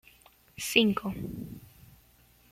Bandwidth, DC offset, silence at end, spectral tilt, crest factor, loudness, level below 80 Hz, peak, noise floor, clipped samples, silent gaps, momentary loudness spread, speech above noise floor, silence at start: 16 kHz; under 0.1%; 0.85 s; -4 dB/octave; 26 dB; -28 LUFS; -58 dBFS; -6 dBFS; -61 dBFS; under 0.1%; none; 23 LU; 32 dB; 0.6 s